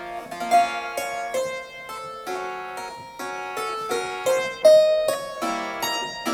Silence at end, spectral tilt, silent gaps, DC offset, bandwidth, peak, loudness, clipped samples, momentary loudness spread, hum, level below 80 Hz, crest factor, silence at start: 0 s; -2 dB/octave; none; under 0.1%; 18 kHz; -4 dBFS; -23 LUFS; under 0.1%; 17 LU; none; -62 dBFS; 20 dB; 0 s